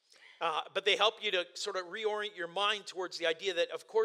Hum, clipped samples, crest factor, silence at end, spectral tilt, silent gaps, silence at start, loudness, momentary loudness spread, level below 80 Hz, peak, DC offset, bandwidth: none; under 0.1%; 22 dB; 0 s; -1.5 dB/octave; none; 0.3 s; -33 LUFS; 9 LU; under -90 dBFS; -12 dBFS; under 0.1%; 13.5 kHz